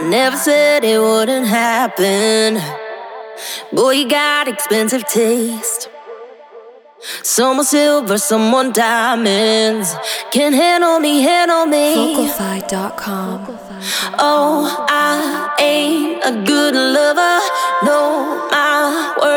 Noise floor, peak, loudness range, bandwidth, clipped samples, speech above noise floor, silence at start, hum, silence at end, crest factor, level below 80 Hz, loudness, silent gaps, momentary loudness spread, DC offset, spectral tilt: -39 dBFS; -2 dBFS; 4 LU; over 20 kHz; under 0.1%; 25 dB; 0 s; none; 0 s; 14 dB; -62 dBFS; -14 LUFS; none; 10 LU; under 0.1%; -2.5 dB/octave